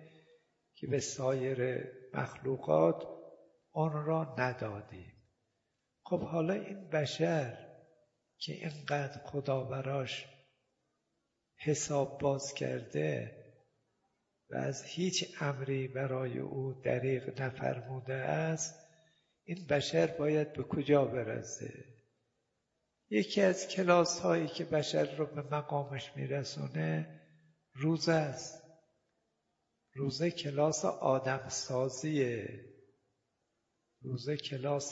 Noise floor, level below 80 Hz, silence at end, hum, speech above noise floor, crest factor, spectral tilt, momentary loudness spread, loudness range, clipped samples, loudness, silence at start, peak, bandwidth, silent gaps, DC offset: -83 dBFS; -72 dBFS; 0 s; none; 49 dB; 24 dB; -5 dB/octave; 13 LU; 5 LU; under 0.1%; -35 LUFS; 0 s; -12 dBFS; 7.6 kHz; none; under 0.1%